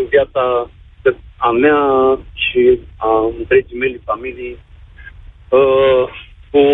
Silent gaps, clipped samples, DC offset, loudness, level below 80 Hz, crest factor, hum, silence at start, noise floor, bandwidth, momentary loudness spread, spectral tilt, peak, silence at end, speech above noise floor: none; under 0.1%; under 0.1%; -15 LUFS; -40 dBFS; 14 dB; none; 0 s; -37 dBFS; 3.9 kHz; 11 LU; -8 dB/octave; 0 dBFS; 0 s; 23 dB